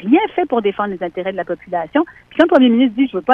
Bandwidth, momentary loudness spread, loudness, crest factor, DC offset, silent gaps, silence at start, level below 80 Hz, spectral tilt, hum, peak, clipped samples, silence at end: 5.2 kHz; 11 LU; -16 LUFS; 16 dB; under 0.1%; none; 0 s; -54 dBFS; -7.5 dB/octave; none; 0 dBFS; under 0.1%; 0 s